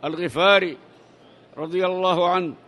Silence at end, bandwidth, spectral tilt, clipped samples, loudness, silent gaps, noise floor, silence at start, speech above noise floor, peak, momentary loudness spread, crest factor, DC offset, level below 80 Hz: 0.1 s; 11.5 kHz; -5.5 dB/octave; under 0.1%; -20 LUFS; none; -51 dBFS; 0 s; 30 dB; -4 dBFS; 12 LU; 18 dB; under 0.1%; -66 dBFS